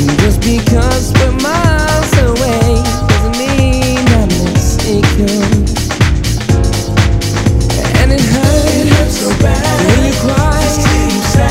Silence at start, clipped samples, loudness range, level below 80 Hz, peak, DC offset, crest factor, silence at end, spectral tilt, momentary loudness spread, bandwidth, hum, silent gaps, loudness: 0 s; 0.7%; 1 LU; -16 dBFS; 0 dBFS; under 0.1%; 10 dB; 0 s; -5 dB/octave; 3 LU; 16.5 kHz; none; none; -11 LUFS